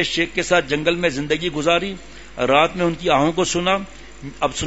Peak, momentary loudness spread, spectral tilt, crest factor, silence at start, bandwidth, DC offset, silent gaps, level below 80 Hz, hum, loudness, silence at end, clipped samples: -2 dBFS; 18 LU; -4 dB/octave; 18 dB; 0 s; 8 kHz; 0.8%; none; -44 dBFS; none; -19 LUFS; 0 s; under 0.1%